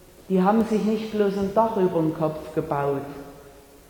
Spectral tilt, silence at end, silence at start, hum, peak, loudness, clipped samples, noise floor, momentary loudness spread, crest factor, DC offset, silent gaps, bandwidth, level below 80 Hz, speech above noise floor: -8 dB/octave; 0.4 s; 0.2 s; none; -6 dBFS; -24 LUFS; under 0.1%; -48 dBFS; 10 LU; 18 dB; under 0.1%; none; 19 kHz; -54 dBFS; 25 dB